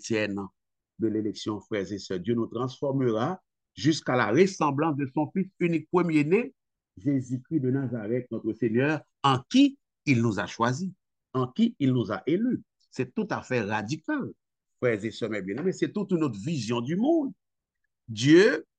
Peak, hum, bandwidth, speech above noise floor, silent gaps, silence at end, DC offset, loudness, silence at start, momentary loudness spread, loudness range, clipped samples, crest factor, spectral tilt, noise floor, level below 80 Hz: -8 dBFS; none; 9 kHz; 57 dB; none; 0.15 s; under 0.1%; -27 LUFS; 0 s; 10 LU; 4 LU; under 0.1%; 20 dB; -6 dB/octave; -83 dBFS; -70 dBFS